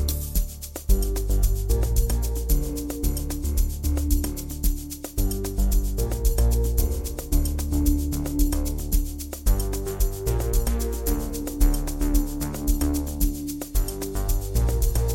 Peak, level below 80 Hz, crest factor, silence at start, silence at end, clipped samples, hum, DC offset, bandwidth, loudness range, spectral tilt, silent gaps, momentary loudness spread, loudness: -8 dBFS; -24 dBFS; 16 dB; 0 s; 0 s; under 0.1%; none; under 0.1%; 17 kHz; 2 LU; -5.5 dB/octave; none; 5 LU; -26 LUFS